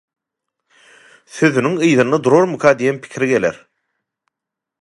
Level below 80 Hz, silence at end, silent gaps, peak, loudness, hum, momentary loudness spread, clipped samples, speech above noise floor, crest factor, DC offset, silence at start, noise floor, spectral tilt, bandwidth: -62 dBFS; 1.25 s; none; 0 dBFS; -15 LUFS; none; 8 LU; under 0.1%; 69 dB; 18 dB; under 0.1%; 1.35 s; -83 dBFS; -6 dB/octave; 11.5 kHz